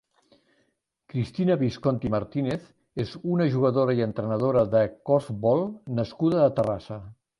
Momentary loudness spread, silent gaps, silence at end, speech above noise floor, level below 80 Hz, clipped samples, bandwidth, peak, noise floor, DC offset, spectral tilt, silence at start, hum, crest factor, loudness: 11 LU; none; 0.25 s; 48 dB; -56 dBFS; under 0.1%; 11 kHz; -8 dBFS; -73 dBFS; under 0.1%; -9 dB/octave; 1.15 s; none; 18 dB; -25 LUFS